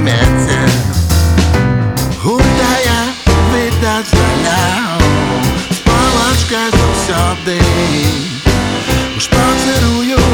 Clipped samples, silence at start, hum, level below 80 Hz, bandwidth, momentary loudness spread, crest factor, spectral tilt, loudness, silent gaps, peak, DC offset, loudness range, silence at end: under 0.1%; 0 s; none; -20 dBFS; 19.5 kHz; 4 LU; 10 dB; -5 dB/octave; -12 LUFS; none; 0 dBFS; under 0.1%; 1 LU; 0 s